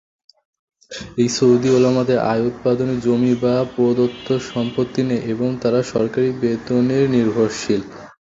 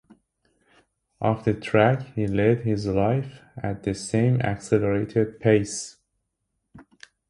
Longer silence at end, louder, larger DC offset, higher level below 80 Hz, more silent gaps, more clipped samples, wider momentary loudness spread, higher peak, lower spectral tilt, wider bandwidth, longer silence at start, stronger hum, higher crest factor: second, 0.3 s vs 0.5 s; first, -18 LUFS vs -24 LUFS; neither; about the same, -52 dBFS vs -50 dBFS; neither; neither; second, 7 LU vs 11 LU; about the same, -4 dBFS vs -4 dBFS; about the same, -6.5 dB/octave vs -6.5 dB/octave; second, 7.8 kHz vs 11.5 kHz; second, 0.9 s vs 1.2 s; neither; second, 14 dB vs 20 dB